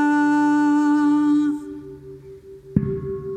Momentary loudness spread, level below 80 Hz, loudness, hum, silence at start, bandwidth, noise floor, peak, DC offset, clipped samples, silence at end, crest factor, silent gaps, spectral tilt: 20 LU; -48 dBFS; -20 LUFS; none; 0 s; 8.8 kHz; -41 dBFS; -4 dBFS; under 0.1%; under 0.1%; 0 s; 16 dB; none; -7.5 dB/octave